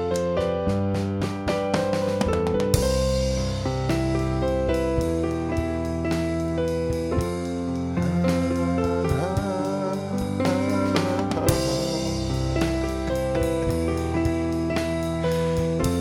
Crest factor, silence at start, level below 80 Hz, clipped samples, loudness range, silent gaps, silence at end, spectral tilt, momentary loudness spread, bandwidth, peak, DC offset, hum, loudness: 20 dB; 0 s; -34 dBFS; under 0.1%; 1 LU; none; 0 s; -6 dB/octave; 4 LU; 19 kHz; -4 dBFS; under 0.1%; none; -24 LUFS